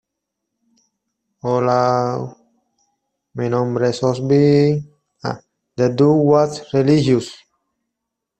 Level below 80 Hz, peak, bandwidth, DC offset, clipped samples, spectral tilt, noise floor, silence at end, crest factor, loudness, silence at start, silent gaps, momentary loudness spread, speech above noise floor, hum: -56 dBFS; -2 dBFS; 8.8 kHz; under 0.1%; under 0.1%; -7.5 dB/octave; -80 dBFS; 1.05 s; 16 dB; -17 LUFS; 1.45 s; none; 15 LU; 64 dB; none